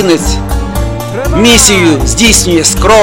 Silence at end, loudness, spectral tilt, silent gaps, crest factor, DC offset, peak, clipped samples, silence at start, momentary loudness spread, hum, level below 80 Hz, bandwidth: 0 s; -7 LUFS; -3.5 dB/octave; none; 8 dB; 2%; 0 dBFS; 1%; 0 s; 12 LU; none; -16 dBFS; over 20 kHz